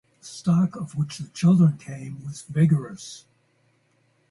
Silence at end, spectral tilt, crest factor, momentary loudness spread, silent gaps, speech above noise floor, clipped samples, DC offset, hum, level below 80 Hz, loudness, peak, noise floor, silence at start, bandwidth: 1.15 s; -7.5 dB/octave; 16 dB; 20 LU; none; 43 dB; under 0.1%; under 0.1%; none; -62 dBFS; -23 LUFS; -8 dBFS; -66 dBFS; 0.25 s; 11.5 kHz